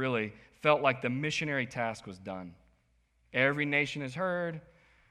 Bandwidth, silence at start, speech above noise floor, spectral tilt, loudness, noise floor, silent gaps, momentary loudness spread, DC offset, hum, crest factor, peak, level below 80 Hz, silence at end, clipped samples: 12 kHz; 0 s; 39 dB; -5.5 dB/octave; -31 LUFS; -71 dBFS; none; 16 LU; under 0.1%; none; 22 dB; -10 dBFS; -68 dBFS; 0.5 s; under 0.1%